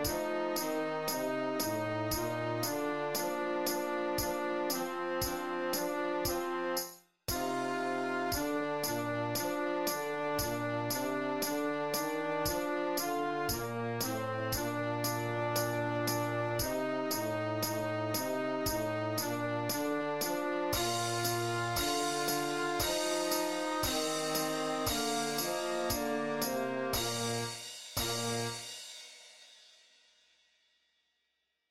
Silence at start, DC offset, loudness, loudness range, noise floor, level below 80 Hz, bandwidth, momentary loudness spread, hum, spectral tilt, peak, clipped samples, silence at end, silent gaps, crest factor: 0 s; 0.1%; -34 LUFS; 3 LU; -82 dBFS; -56 dBFS; 16 kHz; 3 LU; none; -3.5 dB/octave; -18 dBFS; under 0.1%; 1.25 s; none; 16 dB